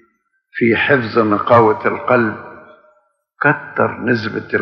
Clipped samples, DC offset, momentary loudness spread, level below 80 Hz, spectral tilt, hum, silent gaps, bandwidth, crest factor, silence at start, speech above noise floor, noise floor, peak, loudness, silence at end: under 0.1%; under 0.1%; 8 LU; -60 dBFS; -8.5 dB/octave; none; none; 6.4 kHz; 16 dB; 0.55 s; 47 dB; -62 dBFS; 0 dBFS; -15 LUFS; 0 s